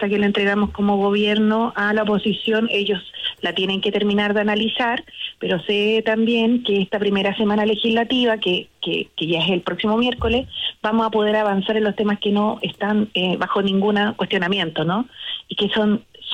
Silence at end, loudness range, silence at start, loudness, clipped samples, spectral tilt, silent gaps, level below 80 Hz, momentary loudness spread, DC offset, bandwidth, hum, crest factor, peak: 0 s; 2 LU; 0 s; -20 LUFS; under 0.1%; -6.5 dB/octave; none; -46 dBFS; 6 LU; under 0.1%; 8.4 kHz; none; 12 dB; -8 dBFS